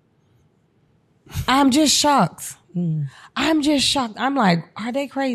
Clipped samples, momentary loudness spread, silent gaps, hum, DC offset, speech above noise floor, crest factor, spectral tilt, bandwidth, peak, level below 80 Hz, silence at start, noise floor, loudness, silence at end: under 0.1%; 13 LU; none; none; under 0.1%; 41 dB; 16 dB; -4 dB/octave; 15.5 kHz; -4 dBFS; -48 dBFS; 1.3 s; -61 dBFS; -19 LUFS; 0 s